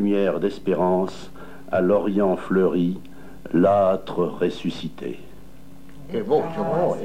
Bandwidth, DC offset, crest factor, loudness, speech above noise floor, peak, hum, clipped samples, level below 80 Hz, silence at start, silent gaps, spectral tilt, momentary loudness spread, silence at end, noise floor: 15.5 kHz; 1%; 16 dB; -22 LUFS; 24 dB; -6 dBFS; none; under 0.1%; -52 dBFS; 0 s; none; -8 dB/octave; 15 LU; 0 s; -46 dBFS